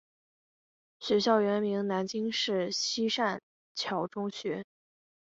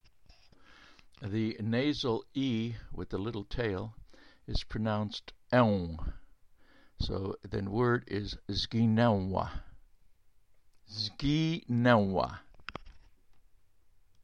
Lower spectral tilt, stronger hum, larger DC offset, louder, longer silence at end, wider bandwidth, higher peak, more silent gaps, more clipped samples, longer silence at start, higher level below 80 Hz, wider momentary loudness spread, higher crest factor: second, -4 dB/octave vs -7 dB/octave; neither; neither; about the same, -30 LUFS vs -32 LUFS; second, 0.55 s vs 1.25 s; about the same, 8 kHz vs 8.8 kHz; about the same, -12 dBFS vs -12 dBFS; first, 3.43-3.75 s vs none; neither; first, 1 s vs 0.8 s; second, -76 dBFS vs -48 dBFS; second, 12 LU vs 18 LU; about the same, 20 dB vs 22 dB